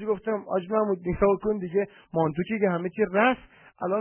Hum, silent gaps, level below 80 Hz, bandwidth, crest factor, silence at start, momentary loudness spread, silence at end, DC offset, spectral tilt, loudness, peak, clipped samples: none; none; -52 dBFS; 3.3 kHz; 18 dB; 0 s; 6 LU; 0 s; under 0.1%; -10.5 dB/octave; -26 LUFS; -8 dBFS; under 0.1%